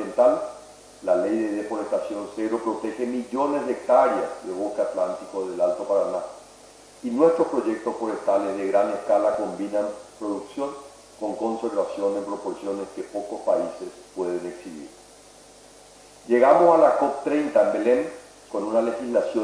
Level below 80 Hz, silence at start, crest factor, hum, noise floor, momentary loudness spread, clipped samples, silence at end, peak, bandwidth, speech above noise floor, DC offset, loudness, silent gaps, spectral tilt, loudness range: -64 dBFS; 0 s; 20 dB; none; -49 dBFS; 14 LU; under 0.1%; 0 s; -4 dBFS; 11 kHz; 26 dB; under 0.1%; -24 LUFS; none; -5.5 dB/octave; 8 LU